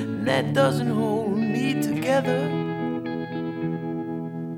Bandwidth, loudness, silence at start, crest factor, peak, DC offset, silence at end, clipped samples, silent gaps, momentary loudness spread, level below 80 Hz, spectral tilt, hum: 17.5 kHz; -25 LUFS; 0 s; 16 dB; -8 dBFS; under 0.1%; 0 s; under 0.1%; none; 9 LU; -62 dBFS; -6.5 dB/octave; none